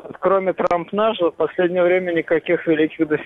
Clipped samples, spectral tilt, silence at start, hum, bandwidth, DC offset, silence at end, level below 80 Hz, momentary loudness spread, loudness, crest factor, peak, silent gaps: under 0.1%; -7.5 dB/octave; 0 s; none; 6.8 kHz; under 0.1%; 0 s; -58 dBFS; 3 LU; -19 LUFS; 14 dB; -6 dBFS; none